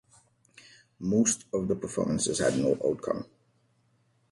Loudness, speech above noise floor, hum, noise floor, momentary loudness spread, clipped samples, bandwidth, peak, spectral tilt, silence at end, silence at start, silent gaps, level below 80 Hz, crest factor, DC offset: -28 LUFS; 41 dB; none; -69 dBFS; 9 LU; under 0.1%; 11.5 kHz; -12 dBFS; -4.5 dB/octave; 1.05 s; 1 s; none; -60 dBFS; 18 dB; under 0.1%